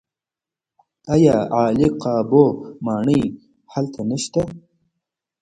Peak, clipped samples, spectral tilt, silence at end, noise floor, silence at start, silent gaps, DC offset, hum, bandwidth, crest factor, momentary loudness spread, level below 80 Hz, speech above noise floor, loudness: 0 dBFS; under 0.1%; -7 dB/octave; 0.85 s; -89 dBFS; 1.05 s; none; under 0.1%; none; 10.5 kHz; 20 dB; 12 LU; -50 dBFS; 71 dB; -19 LUFS